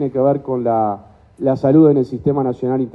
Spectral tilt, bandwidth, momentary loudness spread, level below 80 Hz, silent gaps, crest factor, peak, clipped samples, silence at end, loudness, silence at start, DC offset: -11 dB/octave; 5.8 kHz; 10 LU; -50 dBFS; none; 14 dB; -2 dBFS; under 0.1%; 0.05 s; -16 LUFS; 0 s; under 0.1%